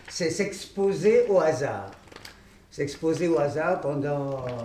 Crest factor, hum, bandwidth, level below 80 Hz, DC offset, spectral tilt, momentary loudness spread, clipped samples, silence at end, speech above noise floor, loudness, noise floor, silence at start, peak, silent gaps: 16 dB; none; 14.5 kHz; -58 dBFS; under 0.1%; -5.5 dB/octave; 21 LU; under 0.1%; 0 s; 24 dB; -25 LUFS; -49 dBFS; 0.05 s; -10 dBFS; none